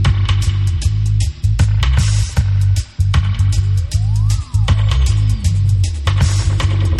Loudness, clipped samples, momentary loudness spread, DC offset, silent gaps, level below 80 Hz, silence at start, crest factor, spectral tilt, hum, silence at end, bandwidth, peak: -16 LUFS; under 0.1%; 2 LU; under 0.1%; none; -20 dBFS; 0 s; 12 dB; -5 dB/octave; none; 0 s; 11.5 kHz; -2 dBFS